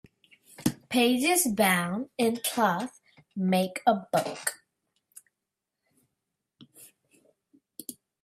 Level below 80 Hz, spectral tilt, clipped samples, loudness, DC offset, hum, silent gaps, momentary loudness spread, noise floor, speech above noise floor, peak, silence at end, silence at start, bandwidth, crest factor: -70 dBFS; -4 dB/octave; under 0.1%; -27 LUFS; under 0.1%; none; none; 19 LU; -86 dBFS; 60 dB; -10 dBFS; 0.3 s; 0.6 s; 16 kHz; 20 dB